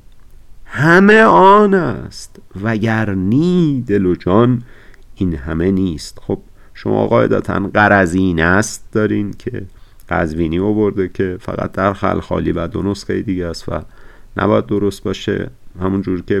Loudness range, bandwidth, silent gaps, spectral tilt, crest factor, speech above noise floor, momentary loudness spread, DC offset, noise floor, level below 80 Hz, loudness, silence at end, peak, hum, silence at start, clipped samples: 7 LU; 13 kHz; none; -6.5 dB/octave; 14 dB; 23 dB; 15 LU; under 0.1%; -38 dBFS; -38 dBFS; -15 LUFS; 0 s; 0 dBFS; none; 0.15 s; under 0.1%